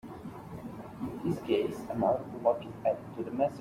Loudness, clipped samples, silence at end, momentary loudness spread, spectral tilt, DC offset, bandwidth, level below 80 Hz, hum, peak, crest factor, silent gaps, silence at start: -32 LUFS; under 0.1%; 0 s; 14 LU; -7.5 dB/octave; under 0.1%; 16 kHz; -62 dBFS; none; -14 dBFS; 20 dB; none; 0.05 s